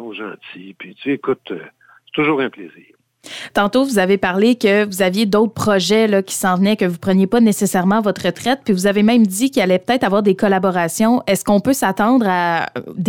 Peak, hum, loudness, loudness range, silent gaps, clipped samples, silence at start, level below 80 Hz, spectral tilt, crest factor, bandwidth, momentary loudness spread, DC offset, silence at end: -2 dBFS; none; -16 LUFS; 5 LU; none; under 0.1%; 0 s; -54 dBFS; -5 dB/octave; 14 dB; 18 kHz; 12 LU; under 0.1%; 0 s